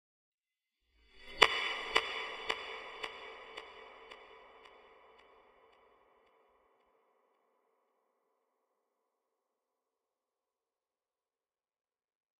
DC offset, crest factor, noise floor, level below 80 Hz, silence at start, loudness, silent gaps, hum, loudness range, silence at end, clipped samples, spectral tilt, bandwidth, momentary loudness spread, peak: under 0.1%; 40 dB; under -90 dBFS; -68 dBFS; 1.15 s; -33 LUFS; none; none; 21 LU; 7.5 s; under 0.1%; -0.5 dB/octave; 16 kHz; 26 LU; -2 dBFS